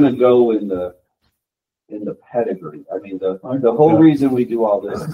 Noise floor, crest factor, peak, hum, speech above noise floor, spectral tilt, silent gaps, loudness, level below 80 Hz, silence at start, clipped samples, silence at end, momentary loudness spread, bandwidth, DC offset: -84 dBFS; 16 dB; 0 dBFS; none; 68 dB; -9 dB/octave; none; -16 LUFS; -56 dBFS; 0 s; under 0.1%; 0 s; 17 LU; 10 kHz; under 0.1%